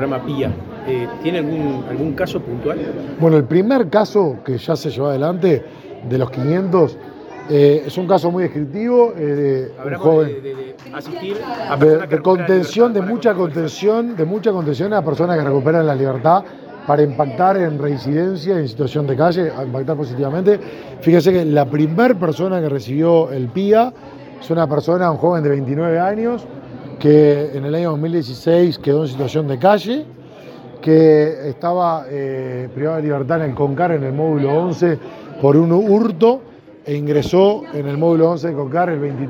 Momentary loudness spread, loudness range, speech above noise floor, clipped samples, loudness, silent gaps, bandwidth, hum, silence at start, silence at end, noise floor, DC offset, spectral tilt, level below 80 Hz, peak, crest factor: 11 LU; 3 LU; 21 dB; under 0.1%; -17 LUFS; none; 17.5 kHz; none; 0 s; 0 s; -36 dBFS; under 0.1%; -8 dB/octave; -56 dBFS; 0 dBFS; 16 dB